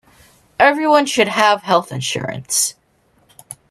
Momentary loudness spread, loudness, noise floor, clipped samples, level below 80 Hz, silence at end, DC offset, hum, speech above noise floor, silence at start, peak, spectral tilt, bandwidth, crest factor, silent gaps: 15 LU; -16 LUFS; -58 dBFS; under 0.1%; -58 dBFS; 0.15 s; under 0.1%; none; 42 dB; 0.6 s; 0 dBFS; -2.5 dB/octave; 13.5 kHz; 18 dB; none